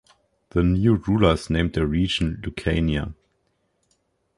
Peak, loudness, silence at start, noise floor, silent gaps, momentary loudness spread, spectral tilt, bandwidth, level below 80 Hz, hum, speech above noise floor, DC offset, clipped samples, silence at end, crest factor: -4 dBFS; -22 LUFS; 0.55 s; -70 dBFS; none; 9 LU; -7 dB/octave; 11.5 kHz; -34 dBFS; none; 49 dB; under 0.1%; under 0.1%; 1.25 s; 20 dB